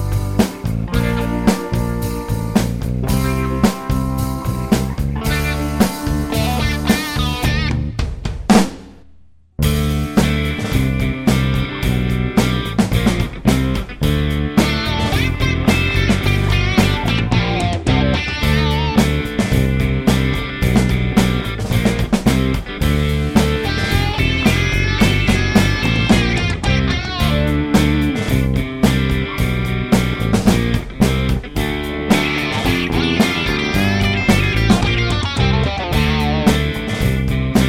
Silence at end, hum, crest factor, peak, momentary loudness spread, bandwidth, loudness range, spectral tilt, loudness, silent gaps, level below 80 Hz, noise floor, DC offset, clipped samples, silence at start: 0 s; none; 16 dB; 0 dBFS; 6 LU; 16.5 kHz; 3 LU; -5.5 dB/octave; -17 LUFS; none; -24 dBFS; -48 dBFS; under 0.1%; under 0.1%; 0 s